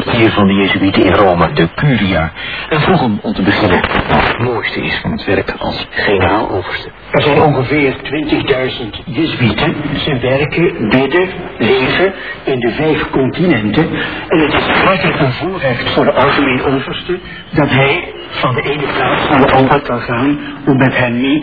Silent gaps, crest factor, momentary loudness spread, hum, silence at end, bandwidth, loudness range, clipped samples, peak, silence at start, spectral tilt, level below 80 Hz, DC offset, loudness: none; 12 dB; 8 LU; none; 0 s; 5.4 kHz; 2 LU; 0.1%; 0 dBFS; 0 s; -9 dB/octave; -34 dBFS; 0.6%; -13 LUFS